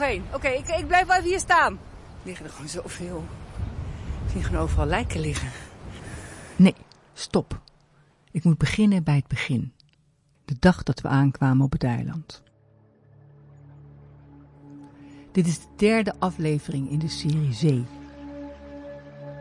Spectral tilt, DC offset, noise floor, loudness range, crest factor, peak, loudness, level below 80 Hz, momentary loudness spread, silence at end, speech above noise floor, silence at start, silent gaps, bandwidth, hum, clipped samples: -6 dB/octave; under 0.1%; -63 dBFS; 6 LU; 22 dB; -4 dBFS; -24 LUFS; -40 dBFS; 21 LU; 0 s; 40 dB; 0 s; none; 11.5 kHz; none; under 0.1%